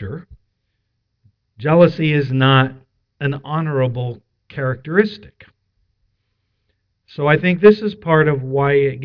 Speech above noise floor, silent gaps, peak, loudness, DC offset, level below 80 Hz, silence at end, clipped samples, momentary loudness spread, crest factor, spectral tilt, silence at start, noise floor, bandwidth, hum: 55 dB; none; 0 dBFS; -16 LUFS; under 0.1%; -52 dBFS; 0 s; under 0.1%; 17 LU; 18 dB; -9.5 dB/octave; 0 s; -71 dBFS; 5.4 kHz; none